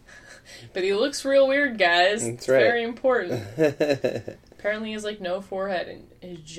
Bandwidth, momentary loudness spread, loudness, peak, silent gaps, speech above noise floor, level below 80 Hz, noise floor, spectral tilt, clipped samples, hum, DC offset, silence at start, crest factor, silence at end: 14.5 kHz; 16 LU; -23 LUFS; -8 dBFS; none; 24 dB; -58 dBFS; -48 dBFS; -4 dB/octave; under 0.1%; none; under 0.1%; 0.1 s; 16 dB; 0 s